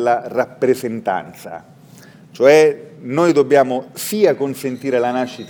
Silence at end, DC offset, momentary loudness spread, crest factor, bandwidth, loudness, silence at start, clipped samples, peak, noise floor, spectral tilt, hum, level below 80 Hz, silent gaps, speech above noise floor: 0 s; under 0.1%; 15 LU; 16 dB; 19.5 kHz; -16 LUFS; 0 s; under 0.1%; 0 dBFS; -43 dBFS; -5 dB/octave; none; -68 dBFS; none; 26 dB